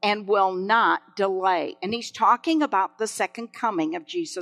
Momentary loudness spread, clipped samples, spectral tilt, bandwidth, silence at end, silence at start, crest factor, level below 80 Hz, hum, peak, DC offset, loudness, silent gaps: 9 LU; under 0.1%; -3.5 dB/octave; 13.5 kHz; 0 s; 0.05 s; 16 dB; -78 dBFS; none; -6 dBFS; under 0.1%; -24 LUFS; none